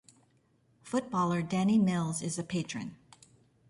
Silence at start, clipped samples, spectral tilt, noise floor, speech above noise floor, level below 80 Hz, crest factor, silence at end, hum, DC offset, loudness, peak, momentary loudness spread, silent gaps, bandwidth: 0.85 s; under 0.1%; -6 dB/octave; -69 dBFS; 39 dB; -68 dBFS; 14 dB; 0.75 s; none; under 0.1%; -31 LUFS; -18 dBFS; 11 LU; none; 11.5 kHz